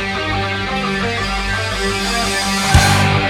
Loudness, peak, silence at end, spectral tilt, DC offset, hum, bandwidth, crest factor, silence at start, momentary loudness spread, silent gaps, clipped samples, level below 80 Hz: -16 LUFS; 0 dBFS; 0 s; -4 dB/octave; under 0.1%; none; 17 kHz; 16 dB; 0 s; 7 LU; none; under 0.1%; -28 dBFS